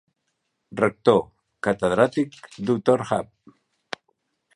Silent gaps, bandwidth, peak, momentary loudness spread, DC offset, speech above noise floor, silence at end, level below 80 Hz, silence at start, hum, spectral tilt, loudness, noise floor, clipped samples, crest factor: none; 11.5 kHz; -2 dBFS; 18 LU; under 0.1%; 54 dB; 1.35 s; -58 dBFS; 0.7 s; none; -6.5 dB/octave; -23 LUFS; -76 dBFS; under 0.1%; 22 dB